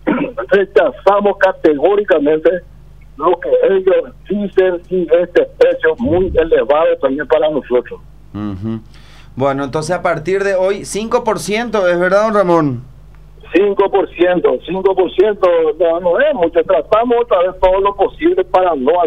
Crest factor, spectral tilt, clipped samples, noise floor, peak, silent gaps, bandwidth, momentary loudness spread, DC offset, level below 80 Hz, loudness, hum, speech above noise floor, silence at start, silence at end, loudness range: 14 dB; -6 dB/octave; under 0.1%; -39 dBFS; 0 dBFS; none; 12.5 kHz; 7 LU; 0.8%; -38 dBFS; -14 LUFS; 50 Hz at -40 dBFS; 26 dB; 0.05 s; 0 s; 4 LU